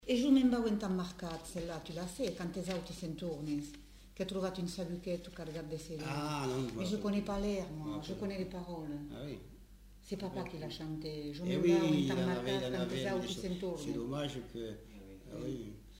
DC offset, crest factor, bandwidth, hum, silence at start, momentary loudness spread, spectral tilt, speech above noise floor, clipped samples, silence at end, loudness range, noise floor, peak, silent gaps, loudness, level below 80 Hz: under 0.1%; 18 dB; 16 kHz; none; 0 s; 14 LU; -6 dB/octave; 20 dB; under 0.1%; 0 s; 7 LU; -57 dBFS; -18 dBFS; none; -38 LUFS; -56 dBFS